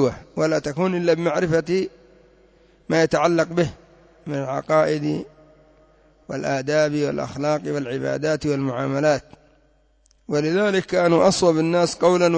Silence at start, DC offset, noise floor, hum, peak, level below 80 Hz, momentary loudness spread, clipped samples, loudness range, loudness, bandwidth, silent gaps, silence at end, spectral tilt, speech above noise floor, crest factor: 0 s; under 0.1%; -59 dBFS; none; -6 dBFS; -54 dBFS; 9 LU; under 0.1%; 4 LU; -21 LUFS; 8 kHz; none; 0 s; -5.5 dB/octave; 39 dB; 16 dB